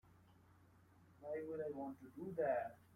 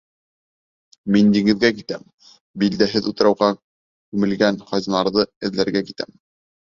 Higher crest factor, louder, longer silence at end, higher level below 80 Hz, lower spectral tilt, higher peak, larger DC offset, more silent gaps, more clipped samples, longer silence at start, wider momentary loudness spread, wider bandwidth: about the same, 18 dB vs 20 dB; second, -45 LUFS vs -19 LUFS; second, 0.1 s vs 0.6 s; second, -82 dBFS vs -56 dBFS; first, -8.5 dB/octave vs -6 dB/octave; second, -28 dBFS vs -2 dBFS; neither; second, none vs 2.14-2.18 s, 2.41-2.54 s, 3.63-4.12 s, 5.36-5.41 s; neither; second, 0.05 s vs 1.05 s; second, 11 LU vs 16 LU; first, 16 kHz vs 7.4 kHz